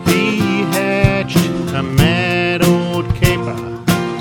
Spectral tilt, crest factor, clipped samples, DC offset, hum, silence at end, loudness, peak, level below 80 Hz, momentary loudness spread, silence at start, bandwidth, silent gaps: -5.5 dB/octave; 14 dB; under 0.1%; under 0.1%; none; 0 s; -15 LUFS; 0 dBFS; -32 dBFS; 6 LU; 0 s; 17.5 kHz; none